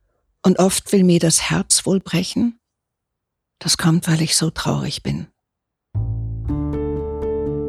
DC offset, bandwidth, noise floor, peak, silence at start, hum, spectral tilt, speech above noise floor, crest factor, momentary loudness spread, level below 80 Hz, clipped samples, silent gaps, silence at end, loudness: under 0.1%; 15 kHz; -80 dBFS; -2 dBFS; 0.45 s; none; -4.5 dB/octave; 62 dB; 18 dB; 11 LU; -38 dBFS; under 0.1%; none; 0 s; -19 LUFS